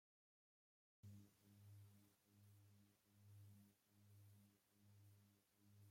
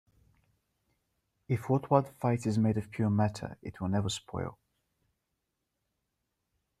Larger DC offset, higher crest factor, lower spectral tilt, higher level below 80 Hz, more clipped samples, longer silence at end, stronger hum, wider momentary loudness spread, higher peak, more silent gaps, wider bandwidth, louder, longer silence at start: neither; second, 16 dB vs 24 dB; second, -5.5 dB/octave vs -7 dB/octave; second, under -90 dBFS vs -64 dBFS; neither; second, 0 s vs 2.25 s; neither; second, 3 LU vs 12 LU; second, -54 dBFS vs -10 dBFS; neither; first, 16.5 kHz vs 13.5 kHz; second, -68 LUFS vs -31 LUFS; second, 1.05 s vs 1.5 s